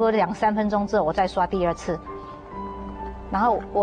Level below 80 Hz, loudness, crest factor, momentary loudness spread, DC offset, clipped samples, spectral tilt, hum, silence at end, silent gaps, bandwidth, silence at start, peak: -42 dBFS; -24 LUFS; 14 dB; 14 LU; under 0.1%; under 0.1%; -6.5 dB/octave; none; 0 s; none; 9.6 kHz; 0 s; -10 dBFS